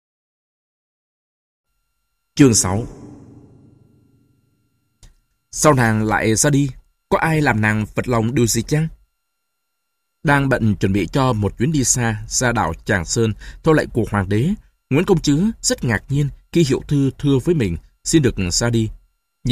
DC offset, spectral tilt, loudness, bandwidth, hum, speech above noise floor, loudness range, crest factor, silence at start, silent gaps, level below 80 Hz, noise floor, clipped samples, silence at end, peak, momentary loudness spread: under 0.1%; -5 dB/octave; -18 LUFS; 15.5 kHz; none; 58 dB; 4 LU; 20 dB; 2.35 s; none; -38 dBFS; -75 dBFS; under 0.1%; 0 s; 0 dBFS; 7 LU